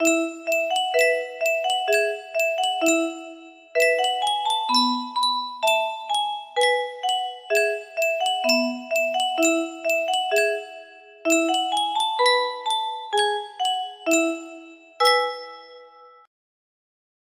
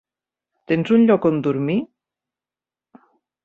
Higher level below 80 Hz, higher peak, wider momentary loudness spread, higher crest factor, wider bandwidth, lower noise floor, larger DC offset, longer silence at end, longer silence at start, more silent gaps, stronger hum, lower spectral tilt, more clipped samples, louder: second, -76 dBFS vs -64 dBFS; about the same, -6 dBFS vs -4 dBFS; about the same, 7 LU vs 9 LU; about the same, 18 dB vs 18 dB; first, 15.5 kHz vs 4.7 kHz; second, -48 dBFS vs under -90 dBFS; neither; second, 1.15 s vs 1.6 s; second, 0 s vs 0.7 s; neither; neither; second, 0.5 dB/octave vs -9 dB/octave; neither; second, -22 LUFS vs -19 LUFS